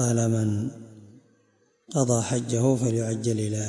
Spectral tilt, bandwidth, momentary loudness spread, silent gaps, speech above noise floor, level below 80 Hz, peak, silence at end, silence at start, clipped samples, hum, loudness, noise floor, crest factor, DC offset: -6 dB/octave; 11.5 kHz; 8 LU; none; 41 dB; -64 dBFS; -10 dBFS; 0 s; 0 s; under 0.1%; none; -25 LUFS; -65 dBFS; 16 dB; under 0.1%